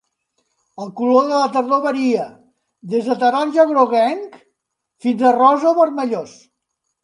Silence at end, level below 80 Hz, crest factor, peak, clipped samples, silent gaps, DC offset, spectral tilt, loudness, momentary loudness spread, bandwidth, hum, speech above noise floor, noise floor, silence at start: 0.75 s; -74 dBFS; 18 dB; 0 dBFS; under 0.1%; none; under 0.1%; -5.5 dB/octave; -16 LUFS; 15 LU; 10.5 kHz; none; 59 dB; -75 dBFS; 0.8 s